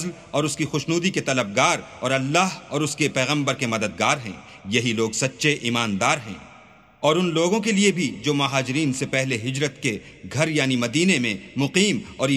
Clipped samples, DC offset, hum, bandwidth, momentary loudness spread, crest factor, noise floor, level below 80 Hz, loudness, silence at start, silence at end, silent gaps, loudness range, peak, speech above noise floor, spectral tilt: under 0.1%; under 0.1%; none; 14 kHz; 6 LU; 20 dB; -50 dBFS; -60 dBFS; -22 LUFS; 0 s; 0 s; none; 1 LU; -2 dBFS; 27 dB; -4 dB/octave